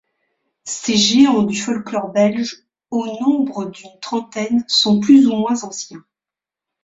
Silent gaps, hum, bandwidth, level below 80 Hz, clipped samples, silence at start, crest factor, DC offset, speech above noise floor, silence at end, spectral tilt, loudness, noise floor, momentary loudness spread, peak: none; none; 8 kHz; -60 dBFS; under 0.1%; 0.65 s; 16 dB; under 0.1%; 72 dB; 0.85 s; -4 dB/octave; -16 LUFS; -88 dBFS; 17 LU; -2 dBFS